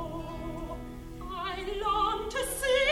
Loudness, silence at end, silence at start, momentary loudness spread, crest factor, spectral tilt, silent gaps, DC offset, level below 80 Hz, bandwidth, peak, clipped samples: -32 LUFS; 0 s; 0 s; 14 LU; 16 dB; -3 dB/octave; none; under 0.1%; -44 dBFS; 16.5 kHz; -16 dBFS; under 0.1%